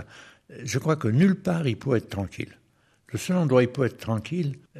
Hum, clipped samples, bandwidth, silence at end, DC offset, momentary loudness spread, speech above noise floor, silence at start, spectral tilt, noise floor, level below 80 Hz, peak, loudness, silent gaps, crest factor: none; under 0.1%; 13.5 kHz; 0 s; under 0.1%; 16 LU; 36 dB; 0 s; -7 dB/octave; -61 dBFS; -60 dBFS; -8 dBFS; -25 LUFS; none; 18 dB